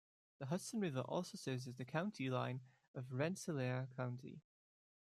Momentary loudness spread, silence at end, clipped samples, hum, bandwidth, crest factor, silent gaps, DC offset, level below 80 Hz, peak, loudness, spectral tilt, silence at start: 11 LU; 0.75 s; under 0.1%; none; 13.5 kHz; 20 dB; 2.88-2.94 s; under 0.1%; -84 dBFS; -24 dBFS; -44 LUFS; -6 dB/octave; 0.4 s